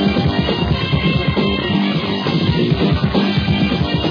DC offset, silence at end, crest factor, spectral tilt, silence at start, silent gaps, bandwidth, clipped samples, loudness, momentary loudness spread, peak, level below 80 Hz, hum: under 0.1%; 0 s; 12 dB; -8 dB/octave; 0 s; none; 5.4 kHz; under 0.1%; -16 LUFS; 2 LU; -4 dBFS; -30 dBFS; none